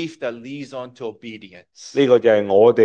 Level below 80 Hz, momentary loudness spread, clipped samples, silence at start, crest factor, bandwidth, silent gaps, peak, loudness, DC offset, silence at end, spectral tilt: -68 dBFS; 22 LU; under 0.1%; 0 s; 16 dB; 8.2 kHz; none; -2 dBFS; -17 LUFS; under 0.1%; 0 s; -6 dB/octave